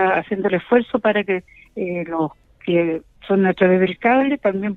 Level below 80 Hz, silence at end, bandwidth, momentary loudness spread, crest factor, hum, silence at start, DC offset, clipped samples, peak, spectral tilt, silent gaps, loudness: -56 dBFS; 0 s; 4.2 kHz; 11 LU; 18 dB; none; 0 s; under 0.1%; under 0.1%; -2 dBFS; -9 dB/octave; none; -19 LUFS